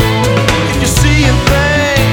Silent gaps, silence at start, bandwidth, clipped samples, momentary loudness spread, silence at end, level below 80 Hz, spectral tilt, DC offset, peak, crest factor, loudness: none; 0 s; 19.5 kHz; under 0.1%; 3 LU; 0 s; -18 dBFS; -4.5 dB/octave; under 0.1%; 0 dBFS; 10 dB; -10 LUFS